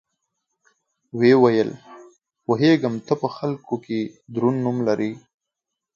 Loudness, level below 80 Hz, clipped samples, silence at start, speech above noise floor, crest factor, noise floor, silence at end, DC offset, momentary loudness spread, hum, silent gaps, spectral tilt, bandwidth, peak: -21 LUFS; -68 dBFS; under 0.1%; 1.15 s; 64 dB; 20 dB; -84 dBFS; 0.75 s; under 0.1%; 13 LU; none; none; -7.5 dB/octave; 7.2 kHz; -2 dBFS